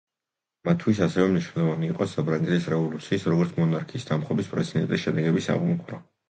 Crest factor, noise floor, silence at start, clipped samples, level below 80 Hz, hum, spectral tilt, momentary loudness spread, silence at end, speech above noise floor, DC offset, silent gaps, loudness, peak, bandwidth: 18 dB; -88 dBFS; 0.65 s; under 0.1%; -58 dBFS; none; -7.5 dB/octave; 5 LU; 0.25 s; 63 dB; under 0.1%; none; -25 LUFS; -6 dBFS; 9 kHz